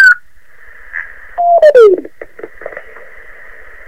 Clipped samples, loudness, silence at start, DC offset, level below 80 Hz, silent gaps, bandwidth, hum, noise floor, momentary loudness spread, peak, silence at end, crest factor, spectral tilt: 2%; -8 LUFS; 0 s; 2%; -48 dBFS; none; 14.5 kHz; none; -44 dBFS; 25 LU; 0 dBFS; 1.1 s; 12 dB; -3.5 dB/octave